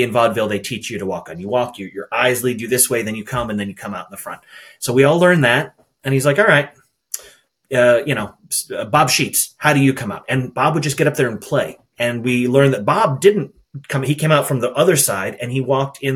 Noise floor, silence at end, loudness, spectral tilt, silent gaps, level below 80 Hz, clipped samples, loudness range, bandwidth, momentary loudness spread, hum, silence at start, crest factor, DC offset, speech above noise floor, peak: -48 dBFS; 0 s; -17 LUFS; -4.5 dB/octave; none; -54 dBFS; under 0.1%; 3 LU; 18 kHz; 15 LU; none; 0 s; 18 dB; under 0.1%; 31 dB; 0 dBFS